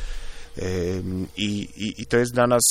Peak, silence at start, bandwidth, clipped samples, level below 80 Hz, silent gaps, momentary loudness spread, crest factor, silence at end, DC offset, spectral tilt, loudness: -6 dBFS; 0 s; 16 kHz; under 0.1%; -38 dBFS; none; 17 LU; 18 dB; 0 s; under 0.1%; -4 dB/octave; -24 LUFS